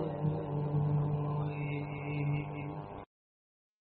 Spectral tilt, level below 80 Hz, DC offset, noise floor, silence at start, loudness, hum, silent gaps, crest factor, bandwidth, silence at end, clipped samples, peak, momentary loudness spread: -8.5 dB/octave; -58 dBFS; under 0.1%; under -90 dBFS; 0 s; -35 LUFS; none; none; 14 dB; 4.2 kHz; 0.75 s; under 0.1%; -22 dBFS; 11 LU